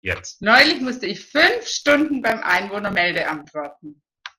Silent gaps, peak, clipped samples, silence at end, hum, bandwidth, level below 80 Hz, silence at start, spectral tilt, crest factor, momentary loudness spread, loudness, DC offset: none; 0 dBFS; under 0.1%; 0.1 s; none; 16.5 kHz; -54 dBFS; 0.05 s; -3 dB/octave; 20 dB; 15 LU; -18 LUFS; under 0.1%